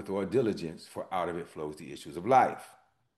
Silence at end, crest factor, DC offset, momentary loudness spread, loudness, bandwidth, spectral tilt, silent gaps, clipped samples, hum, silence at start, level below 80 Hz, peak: 0.45 s; 20 dB; under 0.1%; 17 LU; -31 LUFS; 12.5 kHz; -6 dB/octave; none; under 0.1%; none; 0 s; -68 dBFS; -10 dBFS